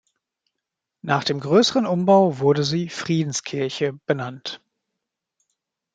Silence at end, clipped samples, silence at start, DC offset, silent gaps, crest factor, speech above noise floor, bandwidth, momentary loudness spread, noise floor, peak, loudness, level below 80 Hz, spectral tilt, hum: 1.4 s; under 0.1%; 1.05 s; under 0.1%; none; 20 dB; 63 dB; 9.4 kHz; 15 LU; -83 dBFS; -2 dBFS; -21 LUFS; -66 dBFS; -5 dB/octave; none